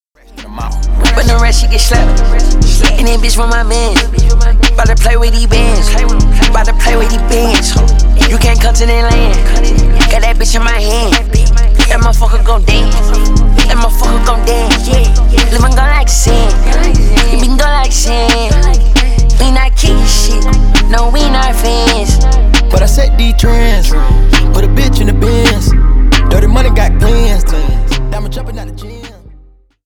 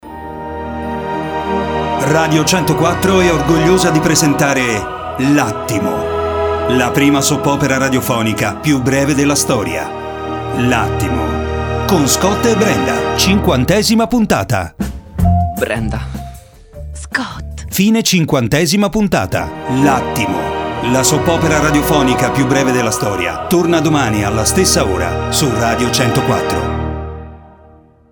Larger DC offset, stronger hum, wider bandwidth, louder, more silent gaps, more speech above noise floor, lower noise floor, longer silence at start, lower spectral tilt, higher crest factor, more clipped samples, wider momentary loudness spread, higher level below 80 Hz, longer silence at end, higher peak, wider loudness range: neither; neither; second, 14.5 kHz vs over 20 kHz; first, -10 LUFS vs -14 LUFS; neither; about the same, 34 dB vs 31 dB; second, -40 dBFS vs -44 dBFS; first, 0.35 s vs 0.05 s; about the same, -4.5 dB/octave vs -4.5 dB/octave; second, 6 dB vs 14 dB; neither; second, 3 LU vs 11 LU; first, -8 dBFS vs -30 dBFS; about the same, 0.75 s vs 0.65 s; about the same, 0 dBFS vs 0 dBFS; about the same, 1 LU vs 3 LU